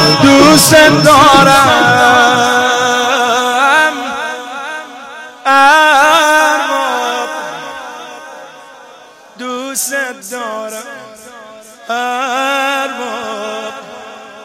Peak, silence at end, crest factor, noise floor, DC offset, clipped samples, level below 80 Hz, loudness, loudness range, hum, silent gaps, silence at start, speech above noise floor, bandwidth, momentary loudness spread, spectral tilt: 0 dBFS; 0 s; 12 dB; -38 dBFS; under 0.1%; 0.3%; -44 dBFS; -9 LUFS; 15 LU; none; none; 0 s; 32 dB; 17 kHz; 23 LU; -3 dB/octave